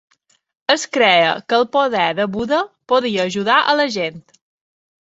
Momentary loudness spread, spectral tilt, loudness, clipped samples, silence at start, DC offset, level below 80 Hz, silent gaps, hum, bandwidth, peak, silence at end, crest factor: 7 LU; -3.5 dB/octave; -17 LUFS; under 0.1%; 0.7 s; under 0.1%; -58 dBFS; none; none; 8 kHz; 0 dBFS; 0.85 s; 18 dB